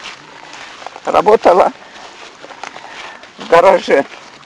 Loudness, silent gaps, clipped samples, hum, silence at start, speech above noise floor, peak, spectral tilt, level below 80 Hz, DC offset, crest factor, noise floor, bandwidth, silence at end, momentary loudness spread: -11 LUFS; none; under 0.1%; none; 0.05 s; 25 dB; 0 dBFS; -4.5 dB/octave; -50 dBFS; under 0.1%; 14 dB; -35 dBFS; 11 kHz; 0.3 s; 24 LU